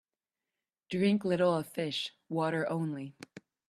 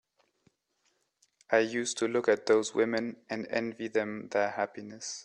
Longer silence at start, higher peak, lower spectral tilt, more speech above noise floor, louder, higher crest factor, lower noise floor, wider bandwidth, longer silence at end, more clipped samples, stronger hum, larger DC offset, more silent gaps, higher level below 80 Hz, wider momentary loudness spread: second, 0.9 s vs 1.5 s; second, -16 dBFS vs -12 dBFS; first, -6.5 dB/octave vs -3.5 dB/octave; first, over 58 dB vs 45 dB; about the same, -32 LUFS vs -30 LUFS; about the same, 18 dB vs 20 dB; first, under -90 dBFS vs -76 dBFS; first, 14 kHz vs 11 kHz; first, 0.3 s vs 0 s; neither; neither; neither; neither; about the same, -76 dBFS vs -78 dBFS; first, 15 LU vs 10 LU